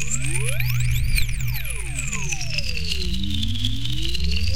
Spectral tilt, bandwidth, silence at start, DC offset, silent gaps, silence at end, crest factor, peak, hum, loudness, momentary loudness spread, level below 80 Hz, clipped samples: -3 dB/octave; 17 kHz; 0 s; 6%; none; 0 s; 18 dB; -4 dBFS; none; -25 LUFS; 4 LU; -28 dBFS; under 0.1%